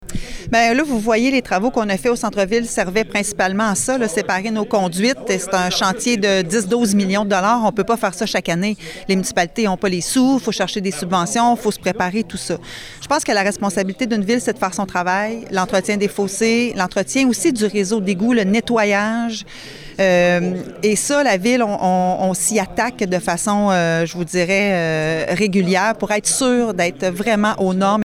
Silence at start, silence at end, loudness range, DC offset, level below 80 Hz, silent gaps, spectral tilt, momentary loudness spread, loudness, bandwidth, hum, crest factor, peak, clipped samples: 0 s; 0 s; 2 LU; under 0.1%; -44 dBFS; none; -4 dB/octave; 5 LU; -18 LUFS; 16 kHz; none; 12 dB; -4 dBFS; under 0.1%